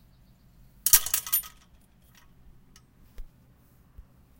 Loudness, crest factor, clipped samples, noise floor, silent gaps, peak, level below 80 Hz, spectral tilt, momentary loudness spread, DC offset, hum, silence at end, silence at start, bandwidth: -22 LUFS; 30 dB; under 0.1%; -59 dBFS; none; -2 dBFS; -52 dBFS; 1.5 dB/octave; 12 LU; under 0.1%; none; 0.4 s; 0.85 s; 17 kHz